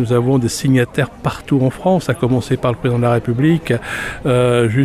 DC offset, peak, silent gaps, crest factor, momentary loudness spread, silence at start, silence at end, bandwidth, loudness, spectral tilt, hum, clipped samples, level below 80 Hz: under 0.1%; -2 dBFS; none; 12 dB; 6 LU; 0 s; 0 s; 14.5 kHz; -16 LUFS; -6.5 dB/octave; none; under 0.1%; -40 dBFS